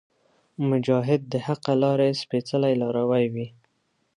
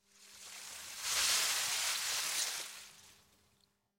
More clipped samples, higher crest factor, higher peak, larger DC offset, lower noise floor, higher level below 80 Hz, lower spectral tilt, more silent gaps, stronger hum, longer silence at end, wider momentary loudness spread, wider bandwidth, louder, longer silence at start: neither; about the same, 16 dB vs 20 dB; first, -8 dBFS vs -20 dBFS; neither; second, -71 dBFS vs -75 dBFS; about the same, -70 dBFS vs -74 dBFS; first, -7.5 dB/octave vs 3 dB/octave; neither; neither; second, 0.65 s vs 0.85 s; second, 6 LU vs 20 LU; second, 10.5 kHz vs 16.5 kHz; first, -24 LUFS vs -33 LUFS; first, 0.6 s vs 0.2 s